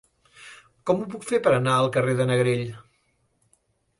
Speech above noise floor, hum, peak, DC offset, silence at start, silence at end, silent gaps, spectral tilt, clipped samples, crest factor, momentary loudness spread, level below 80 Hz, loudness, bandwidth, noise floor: 46 dB; none; -6 dBFS; under 0.1%; 0.4 s; 1.2 s; none; -6 dB/octave; under 0.1%; 20 dB; 21 LU; -62 dBFS; -23 LUFS; 11.5 kHz; -69 dBFS